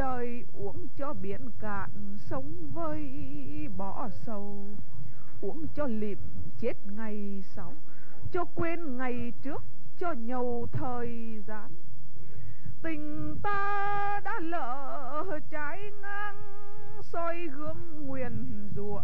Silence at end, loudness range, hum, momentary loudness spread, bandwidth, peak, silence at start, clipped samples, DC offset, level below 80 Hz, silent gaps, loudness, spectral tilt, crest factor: 0 s; 5 LU; none; 14 LU; over 20 kHz; -14 dBFS; 0 s; under 0.1%; 10%; -56 dBFS; none; -37 LUFS; -8 dB/octave; 16 dB